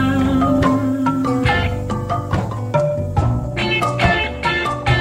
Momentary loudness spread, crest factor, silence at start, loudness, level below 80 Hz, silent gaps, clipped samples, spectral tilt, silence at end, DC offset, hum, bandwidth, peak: 6 LU; 16 dB; 0 s; -18 LUFS; -30 dBFS; none; under 0.1%; -6.5 dB/octave; 0 s; under 0.1%; none; 15.5 kHz; -2 dBFS